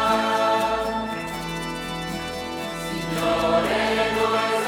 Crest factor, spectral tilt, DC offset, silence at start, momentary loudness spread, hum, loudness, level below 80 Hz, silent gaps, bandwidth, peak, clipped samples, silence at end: 16 dB; -4 dB/octave; under 0.1%; 0 s; 9 LU; none; -24 LUFS; -46 dBFS; none; 18.5 kHz; -8 dBFS; under 0.1%; 0 s